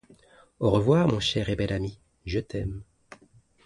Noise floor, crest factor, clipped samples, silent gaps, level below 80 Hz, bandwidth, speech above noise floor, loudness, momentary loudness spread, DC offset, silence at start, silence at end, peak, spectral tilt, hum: -59 dBFS; 20 dB; under 0.1%; none; -46 dBFS; 11.5 kHz; 34 dB; -26 LUFS; 15 LU; under 0.1%; 0.6 s; 0.85 s; -8 dBFS; -6.5 dB/octave; none